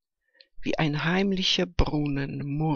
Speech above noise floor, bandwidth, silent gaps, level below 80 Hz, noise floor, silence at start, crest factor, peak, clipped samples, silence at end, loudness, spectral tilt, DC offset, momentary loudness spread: 36 dB; 7.2 kHz; none; -36 dBFS; -62 dBFS; 0.6 s; 18 dB; -8 dBFS; under 0.1%; 0 s; -26 LUFS; -5.5 dB/octave; under 0.1%; 8 LU